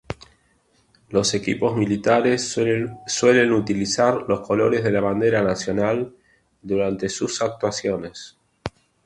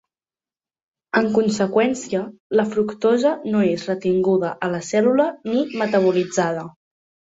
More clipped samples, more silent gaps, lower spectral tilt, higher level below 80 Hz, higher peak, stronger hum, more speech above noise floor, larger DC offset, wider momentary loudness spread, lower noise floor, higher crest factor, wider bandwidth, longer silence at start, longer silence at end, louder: neither; second, none vs 2.40-2.50 s; about the same, -4.5 dB/octave vs -5.5 dB/octave; first, -52 dBFS vs -62 dBFS; about the same, -4 dBFS vs -2 dBFS; neither; second, 42 dB vs over 71 dB; neither; first, 16 LU vs 6 LU; second, -62 dBFS vs under -90 dBFS; about the same, 18 dB vs 18 dB; first, 11.5 kHz vs 8 kHz; second, 0.1 s vs 1.15 s; second, 0.35 s vs 0.7 s; about the same, -21 LUFS vs -20 LUFS